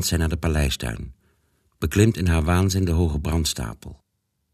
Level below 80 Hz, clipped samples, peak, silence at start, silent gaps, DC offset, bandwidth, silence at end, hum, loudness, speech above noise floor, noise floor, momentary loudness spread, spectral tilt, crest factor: -30 dBFS; under 0.1%; -4 dBFS; 0 s; none; under 0.1%; 14 kHz; 0.6 s; none; -22 LUFS; 53 dB; -74 dBFS; 16 LU; -5 dB/octave; 18 dB